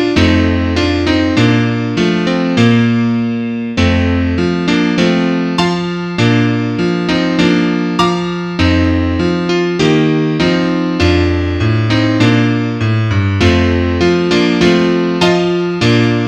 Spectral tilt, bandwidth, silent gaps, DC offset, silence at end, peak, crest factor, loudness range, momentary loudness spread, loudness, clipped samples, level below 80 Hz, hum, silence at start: -6.5 dB/octave; 9.8 kHz; none; under 0.1%; 0 s; 0 dBFS; 12 dB; 2 LU; 4 LU; -13 LUFS; under 0.1%; -30 dBFS; none; 0 s